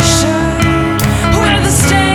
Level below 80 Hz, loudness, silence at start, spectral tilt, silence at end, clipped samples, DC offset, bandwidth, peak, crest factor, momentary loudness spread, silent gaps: -22 dBFS; -11 LUFS; 0 s; -4 dB/octave; 0 s; under 0.1%; under 0.1%; over 20 kHz; 0 dBFS; 10 dB; 3 LU; none